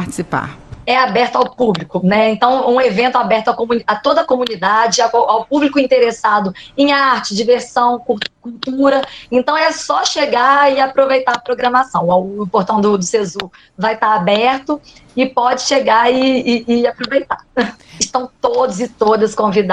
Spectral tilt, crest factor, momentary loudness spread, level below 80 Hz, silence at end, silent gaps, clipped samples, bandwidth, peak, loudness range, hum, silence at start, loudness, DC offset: -4 dB/octave; 14 dB; 8 LU; -50 dBFS; 0 s; none; under 0.1%; 11.5 kHz; 0 dBFS; 2 LU; none; 0 s; -14 LUFS; under 0.1%